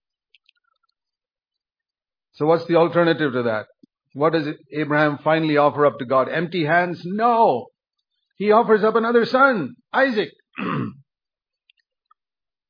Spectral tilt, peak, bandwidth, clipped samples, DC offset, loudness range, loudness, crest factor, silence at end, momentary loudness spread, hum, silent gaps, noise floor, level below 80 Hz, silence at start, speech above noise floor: -8.5 dB/octave; -2 dBFS; 5.2 kHz; under 0.1%; under 0.1%; 4 LU; -20 LUFS; 18 dB; 1.75 s; 10 LU; none; none; under -90 dBFS; -72 dBFS; 2.4 s; over 71 dB